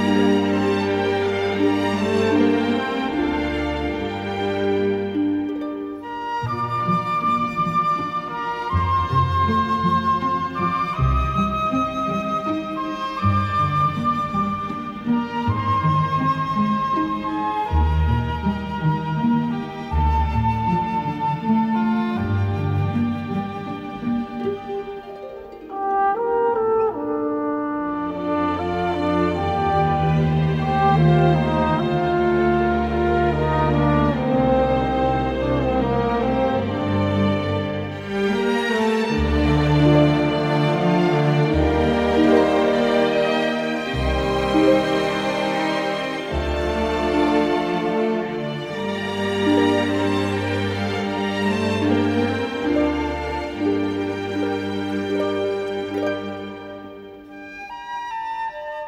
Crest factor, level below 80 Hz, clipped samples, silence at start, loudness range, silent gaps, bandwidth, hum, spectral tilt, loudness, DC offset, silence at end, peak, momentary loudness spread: 18 dB; -34 dBFS; under 0.1%; 0 s; 5 LU; none; 12 kHz; none; -7.5 dB/octave; -21 LUFS; under 0.1%; 0 s; -4 dBFS; 9 LU